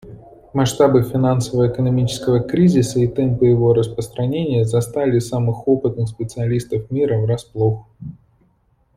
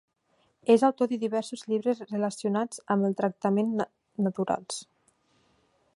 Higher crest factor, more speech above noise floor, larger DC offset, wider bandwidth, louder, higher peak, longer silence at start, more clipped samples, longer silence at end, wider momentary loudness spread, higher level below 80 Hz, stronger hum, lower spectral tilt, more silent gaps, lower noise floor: about the same, 16 dB vs 20 dB; about the same, 43 dB vs 43 dB; neither; first, 15 kHz vs 11.5 kHz; first, -18 LUFS vs -28 LUFS; first, -2 dBFS vs -8 dBFS; second, 0.05 s vs 0.65 s; neither; second, 0.85 s vs 1.1 s; about the same, 9 LU vs 10 LU; first, -46 dBFS vs -76 dBFS; neither; first, -7.5 dB/octave vs -6 dB/octave; neither; second, -60 dBFS vs -70 dBFS